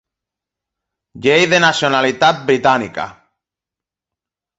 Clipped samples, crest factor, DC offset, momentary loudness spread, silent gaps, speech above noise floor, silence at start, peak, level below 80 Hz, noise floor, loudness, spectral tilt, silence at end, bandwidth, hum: under 0.1%; 18 dB; under 0.1%; 13 LU; none; 73 dB; 1.15 s; 0 dBFS; -56 dBFS; -87 dBFS; -14 LUFS; -4 dB/octave; 1.45 s; 8.2 kHz; none